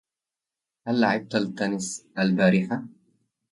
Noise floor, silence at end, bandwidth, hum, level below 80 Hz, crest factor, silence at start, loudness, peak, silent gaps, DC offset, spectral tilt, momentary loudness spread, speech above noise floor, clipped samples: -89 dBFS; 0.65 s; 11.5 kHz; none; -66 dBFS; 18 dB; 0.85 s; -25 LUFS; -8 dBFS; none; under 0.1%; -5.5 dB/octave; 12 LU; 65 dB; under 0.1%